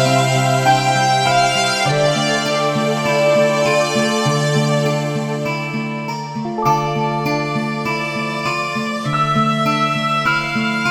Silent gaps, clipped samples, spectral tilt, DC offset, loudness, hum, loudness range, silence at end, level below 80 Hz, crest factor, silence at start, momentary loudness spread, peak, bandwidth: none; under 0.1%; -4.5 dB/octave; under 0.1%; -17 LUFS; none; 5 LU; 0 s; -50 dBFS; 16 dB; 0 s; 7 LU; -2 dBFS; 16.5 kHz